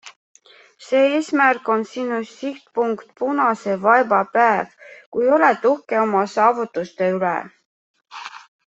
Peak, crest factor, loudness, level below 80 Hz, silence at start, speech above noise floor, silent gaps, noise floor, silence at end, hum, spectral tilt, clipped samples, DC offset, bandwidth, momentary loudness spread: -2 dBFS; 18 dB; -19 LUFS; -70 dBFS; 0.05 s; 29 dB; 0.16-0.34 s, 5.06-5.12 s, 7.66-7.94 s; -48 dBFS; 0.35 s; none; -5.5 dB/octave; under 0.1%; under 0.1%; 8.2 kHz; 14 LU